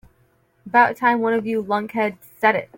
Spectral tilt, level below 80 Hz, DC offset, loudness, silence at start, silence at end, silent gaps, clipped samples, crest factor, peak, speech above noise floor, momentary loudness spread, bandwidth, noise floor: -6 dB/octave; -64 dBFS; under 0.1%; -20 LUFS; 0.65 s; 0.1 s; none; under 0.1%; 18 dB; -2 dBFS; 42 dB; 7 LU; 17 kHz; -61 dBFS